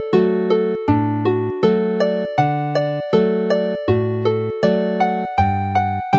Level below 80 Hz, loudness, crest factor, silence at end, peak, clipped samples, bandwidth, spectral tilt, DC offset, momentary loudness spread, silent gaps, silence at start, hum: -48 dBFS; -19 LUFS; 16 dB; 0 s; 0 dBFS; under 0.1%; 7.4 kHz; -8.5 dB/octave; under 0.1%; 3 LU; none; 0 s; none